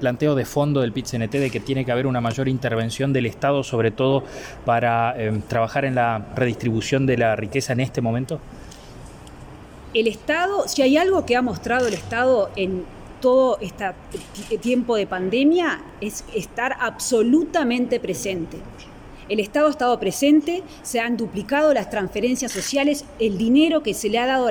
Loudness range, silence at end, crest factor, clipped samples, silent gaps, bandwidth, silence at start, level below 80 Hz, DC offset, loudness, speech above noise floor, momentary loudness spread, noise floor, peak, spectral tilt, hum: 3 LU; 0 s; 14 dB; under 0.1%; none; 17.5 kHz; 0 s; -48 dBFS; under 0.1%; -21 LUFS; 19 dB; 13 LU; -40 dBFS; -6 dBFS; -5.5 dB/octave; none